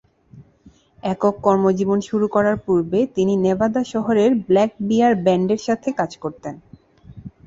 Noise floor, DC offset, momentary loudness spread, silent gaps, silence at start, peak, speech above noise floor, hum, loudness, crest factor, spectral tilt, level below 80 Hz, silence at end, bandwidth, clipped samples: -52 dBFS; under 0.1%; 9 LU; none; 0.35 s; -2 dBFS; 33 dB; none; -19 LUFS; 18 dB; -7 dB/octave; -54 dBFS; 0.2 s; 7.8 kHz; under 0.1%